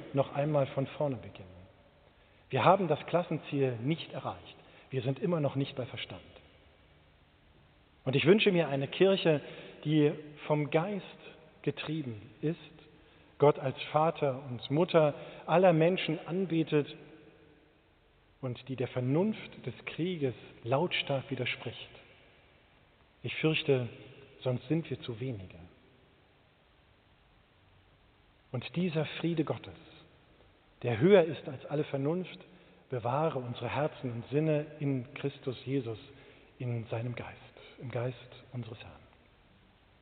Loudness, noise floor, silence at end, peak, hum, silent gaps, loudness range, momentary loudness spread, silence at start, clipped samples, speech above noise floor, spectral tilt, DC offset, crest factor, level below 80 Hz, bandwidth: -32 LUFS; -65 dBFS; 1.05 s; -8 dBFS; none; none; 10 LU; 19 LU; 0 s; under 0.1%; 34 dB; -5.5 dB/octave; under 0.1%; 24 dB; -68 dBFS; 4.6 kHz